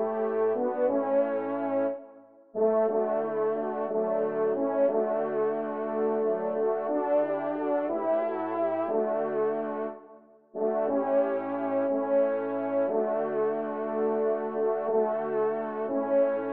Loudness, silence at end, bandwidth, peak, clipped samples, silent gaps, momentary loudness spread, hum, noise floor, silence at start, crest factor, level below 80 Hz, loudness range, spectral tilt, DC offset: -28 LUFS; 0 s; 3.8 kHz; -14 dBFS; under 0.1%; none; 5 LU; none; -53 dBFS; 0 s; 14 dB; -82 dBFS; 2 LU; -6.5 dB/octave; under 0.1%